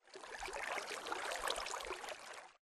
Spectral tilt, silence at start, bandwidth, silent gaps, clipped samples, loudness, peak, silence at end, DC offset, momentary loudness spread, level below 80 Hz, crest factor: -0.5 dB/octave; 0.05 s; 13 kHz; none; under 0.1%; -43 LUFS; -24 dBFS; 0.1 s; under 0.1%; 10 LU; -68 dBFS; 22 dB